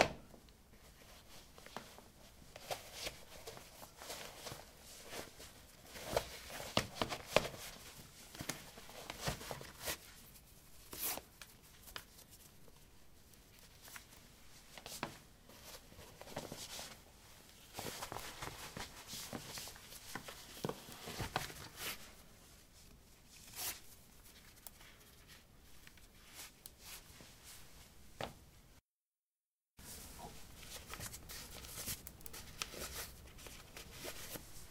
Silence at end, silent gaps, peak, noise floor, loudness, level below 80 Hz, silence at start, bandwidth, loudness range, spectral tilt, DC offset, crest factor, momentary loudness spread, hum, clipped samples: 0 s; 28.85-29.12 s, 29.18-29.32 s, 29.46-29.61 s; -10 dBFS; under -90 dBFS; -47 LUFS; -62 dBFS; 0 s; 16 kHz; 13 LU; -2.5 dB/octave; under 0.1%; 38 dB; 18 LU; none; under 0.1%